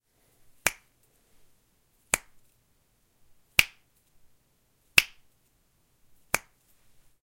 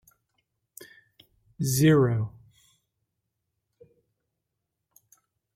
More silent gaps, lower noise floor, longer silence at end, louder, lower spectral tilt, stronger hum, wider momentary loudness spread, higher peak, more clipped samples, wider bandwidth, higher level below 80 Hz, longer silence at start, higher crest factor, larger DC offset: neither; second, -69 dBFS vs -83 dBFS; second, 0.85 s vs 3.25 s; second, -27 LUFS vs -24 LUFS; second, 0 dB/octave vs -6 dB/octave; neither; second, 14 LU vs 28 LU; first, 0 dBFS vs -8 dBFS; neither; about the same, 16.5 kHz vs 16 kHz; about the same, -58 dBFS vs -62 dBFS; second, 0.65 s vs 1.6 s; first, 34 dB vs 22 dB; neither